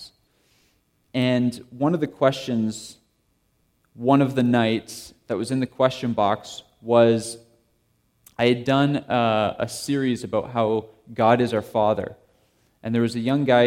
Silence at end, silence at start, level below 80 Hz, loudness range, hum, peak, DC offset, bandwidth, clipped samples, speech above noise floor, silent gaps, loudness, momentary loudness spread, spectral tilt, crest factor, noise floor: 0 s; 0 s; -62 dBFS; 3 LU; none; -4 dBFS; under 0.1%; 15.5 kHz; under 0.1%; 46 dB; none; -22 LUFS; 16 LU; -6 dB/octave; 20 dB; -67 dBFS